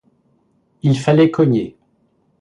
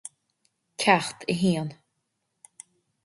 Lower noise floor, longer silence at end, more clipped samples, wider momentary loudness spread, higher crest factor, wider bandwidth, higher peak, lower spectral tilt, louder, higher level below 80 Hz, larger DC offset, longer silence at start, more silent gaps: second, -61 dBFS vs -78 dBFS; second, 0.7 s vs 1.3 s; neither; second, 9 LU vs 24 LU; second, 16 dB vs 24 dB; about the same, 11 kHz vs 11.5 kHz; about the same, -2 dBFS vs -4 dBFS; first, -8 dB/octave vs -4.5 dB/octave; first, -16 LUFS vs -25 LUFS; first, -56 dBFS vs -66 dBFS; neither; about the same, 0.85 s vs 0.8 s; neither